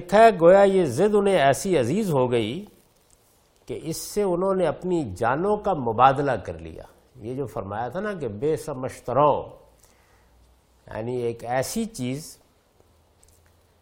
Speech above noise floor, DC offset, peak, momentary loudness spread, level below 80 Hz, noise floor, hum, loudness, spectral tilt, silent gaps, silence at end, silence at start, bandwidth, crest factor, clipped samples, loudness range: 38 dB; under 0.1%; -2 dBFS; 18 LU; -52 dBFS; -60 dBFS; none; -22 LUFS; -5.5 dB/octave; none; 1.5 s; 0 s; 16.5 kHz; 22 dB; under 0.1%; 10 LU